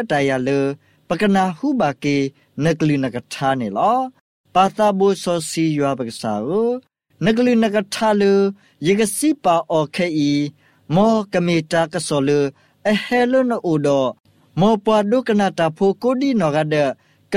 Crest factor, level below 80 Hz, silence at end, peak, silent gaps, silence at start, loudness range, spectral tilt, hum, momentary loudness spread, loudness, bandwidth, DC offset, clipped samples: 16 dB; -56 dBFS; 0 s; -2 dBFS; 4.21-4.44 s, 14.20-14.24 s; 0 s; 2 LU; -5.5 dB/octave; none; 7 LU; -18 LUFS; 15.5 kHz; under 0.1%; under 0.1%